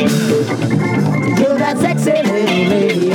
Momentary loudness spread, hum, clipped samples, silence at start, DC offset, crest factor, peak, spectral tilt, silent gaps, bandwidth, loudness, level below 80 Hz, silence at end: 2 LU; none; under 0.1%; 0 s; under 0.1%; 12 dB; -2 dBFS; -6 dB/octave; none; 18.5 kHz; -14 LUFS; -54 dBFS; 0 s